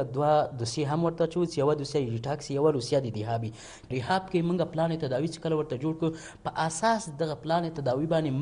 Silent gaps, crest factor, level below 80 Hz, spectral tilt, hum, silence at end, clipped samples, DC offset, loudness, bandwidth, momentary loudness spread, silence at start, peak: none; 16 dB; -58 dBFS; -6 dB/octave; none; 0 s; under 0.1%; under 0.1%; -29 LUFS; 10.5 kHz; 7 LU; 0 s; -12 dBFS